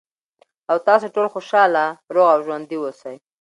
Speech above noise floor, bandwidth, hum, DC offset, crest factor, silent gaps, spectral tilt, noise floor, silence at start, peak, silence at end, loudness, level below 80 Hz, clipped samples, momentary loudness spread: 43 dB; 11 kHz; none; under 0.1%; 18 dB; none; -5 dB/octave; -61 dBFS; 0.7 s; -2 dBFS; 0.25 s; -18 LUFS; -78 dBFS; under 0.1%; 16 LU